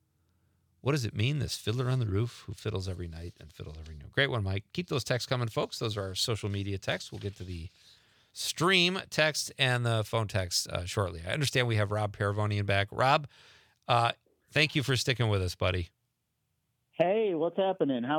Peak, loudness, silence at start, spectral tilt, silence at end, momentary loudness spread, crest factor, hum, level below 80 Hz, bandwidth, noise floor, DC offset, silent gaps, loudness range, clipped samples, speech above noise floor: -8 dBFS; -30 LUFS; 0.85 s; -4.5 dB/octave; 0 s; 15 LU; 22 dB; none; -60 dBFS; 19 kHz; -80 dBFS; under 0.1%; none; 5 LU; under 0.1%; 50 dB